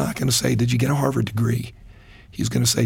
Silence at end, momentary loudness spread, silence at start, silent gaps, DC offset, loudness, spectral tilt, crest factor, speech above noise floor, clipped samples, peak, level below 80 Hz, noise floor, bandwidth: 0 s; 9 LU; 0 s; none; under 0.1%; -21 LUFS; -4.5 dB/octave; 16 dB; 24 dB; under 0.1%; -6 dBFS; -44 dBFS; -45 dBFS; 17 kHz